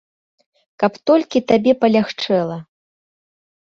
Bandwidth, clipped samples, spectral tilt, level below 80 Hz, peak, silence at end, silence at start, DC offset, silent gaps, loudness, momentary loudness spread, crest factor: 7.4 kHz; under 0.1%; -6.5 dB/octave; -60 dBFS; -2 dBFS; 1.15 s; 0.8 s; under 0.1%; none; -17 LUFS; 7 LU; 18 dB